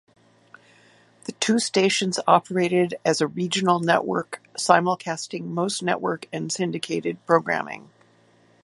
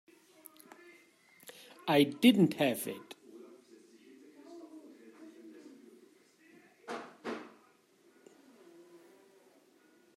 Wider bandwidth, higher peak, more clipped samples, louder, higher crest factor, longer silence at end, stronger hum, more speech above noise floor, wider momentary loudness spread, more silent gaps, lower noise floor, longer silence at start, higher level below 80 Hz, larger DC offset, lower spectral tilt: second, 11.5 kHz vs 16 kHz; first, 0 dBFS vs -12 dBFS; neither; first, -23 LUFS vs -31 LUFS; about the same, 24 dB vs 26 dB; second, 0.85 s vs 2.75 s; neither; second, 35 dB vs 39 dB; second, 10 LU vs 30 LU; neither; second, -58 dBFS vs -66 dBFS; second, 1.3 s vs 1.85 s; first, -72 dBFS vs -84 dBFS; neither; second, -4 dB/octave vs -5.5 dB/octave